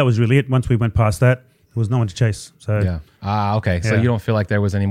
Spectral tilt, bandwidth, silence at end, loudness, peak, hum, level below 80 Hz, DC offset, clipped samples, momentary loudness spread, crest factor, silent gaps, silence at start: -7 dB/octave; 12.5 kHz; 0 s; -19 LUFS; -2 dBFS; none; -38 dBFS; under 0.1%; under 0.1%; 8 LU; 16 dB; none; 0 s